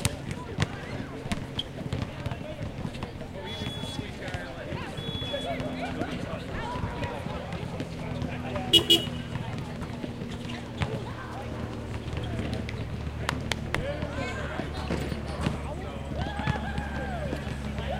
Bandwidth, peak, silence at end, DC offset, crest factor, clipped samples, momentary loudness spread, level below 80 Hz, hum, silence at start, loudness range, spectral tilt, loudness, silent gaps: 16.5 kHz; -2 dBFS; 0 s; under 0.1%; 30 dB; under 0.1%; 6 LU; -42 dBFS; none; 0 s; 8 LU; -4.5 dB/octave; -31 LUFS; none